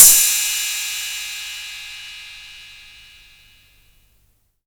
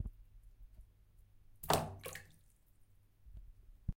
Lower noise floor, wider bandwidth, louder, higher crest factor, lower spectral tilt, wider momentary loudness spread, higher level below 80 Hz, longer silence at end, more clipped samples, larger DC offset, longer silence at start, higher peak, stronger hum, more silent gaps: second, -61 dBFS vs -66 dBFS; first, over 20 kHz vs 16.5 kHz; first, -17 LUFS vs -40 LUFS; second, 20 dB vs 34 dB; second, 3.5 dB/octave vs -4 dB/octave; second, 24 LU vs 28 LU; about the same, -52 dBFS vs -54 dBFS; first, 2 s vs 0.05 s; neither; neither; about the same, 0 s vs 0 s; first, 0 dBFS vs -12 dBFS; first, 50 Hz at -60 dBFS vs none; neither